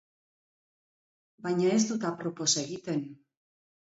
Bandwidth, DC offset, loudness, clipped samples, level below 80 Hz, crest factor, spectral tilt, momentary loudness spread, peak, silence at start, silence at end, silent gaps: 8 kHz; under 0.1%; -29 LUFS; under 0.1%; -78 dBFS; 20 dB; -4 dB/octave; 9 LU; -14 dBFS; 1.4 s; 0.85 s; none